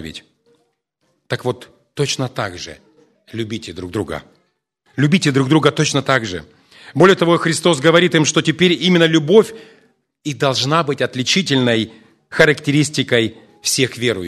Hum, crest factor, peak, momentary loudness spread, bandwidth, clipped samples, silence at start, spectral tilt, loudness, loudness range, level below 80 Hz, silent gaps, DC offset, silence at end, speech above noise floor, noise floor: none; 18 dB; 0 dBFS; 16 LU; 13.5 kHz; under 0.1%; 0 s; -4.5 dB/octave; -16 LUFS; 12 LU; -54 dBFS; none; under 0.1%; 0 s; 51 dB; -67 dBFS